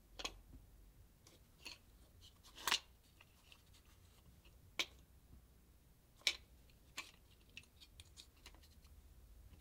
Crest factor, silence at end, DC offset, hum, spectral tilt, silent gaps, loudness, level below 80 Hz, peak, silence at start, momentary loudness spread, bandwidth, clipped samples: 38 dB; 0 s; under 0.1%; none; -0.5 dB/octave; none; -44 LUFS; -66 dBFS; -14 dBFS; 0 s; 27 LU; 16 kHz; under 0.1%